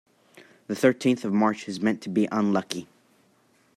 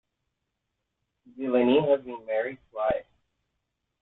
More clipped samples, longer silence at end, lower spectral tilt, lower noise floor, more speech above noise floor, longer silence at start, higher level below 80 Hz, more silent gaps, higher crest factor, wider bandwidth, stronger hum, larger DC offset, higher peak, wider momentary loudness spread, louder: neither; about the same, 0.9 s vs 1 s; second, -6 dB/octave vs -9.5 dB/octave; second, -63 dBFS vs -82 dBFS; second, 39 dB vs 56 dB; second, 0.7 s vs 1.35 s; second, -72 dBFS vs -62 dBFS; neither; about the same, 20 dB vs 20 dB; first, 14 kHz vs 4.1 kHz; neither; neither; first, -6 dBFS vs -10 dBFS; about the same, 11 LU vs 12 LU; about the same, -25 LUFS vs -27 LUFS